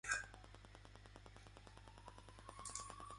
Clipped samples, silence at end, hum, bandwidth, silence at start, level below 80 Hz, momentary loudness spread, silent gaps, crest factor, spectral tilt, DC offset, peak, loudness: under 0.1%; 0 s; none; 11.5 kHz; 0.05 s; -64 dBFS; 15 LU; none; 26 dB; -1.5 dB/octave; under 0.1%; -26 dBFS; -53 LUFS